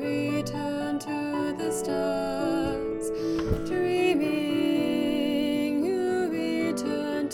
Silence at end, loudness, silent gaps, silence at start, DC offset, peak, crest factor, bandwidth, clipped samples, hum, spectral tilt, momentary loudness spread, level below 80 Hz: 0 s; -27 LUFS; none; 0 s; under 0.1%; -12 dBFS; 14 dB; 17 kHz; under 0.1%; none; -5.5 dB/octave; 5 LU; -48 dBFS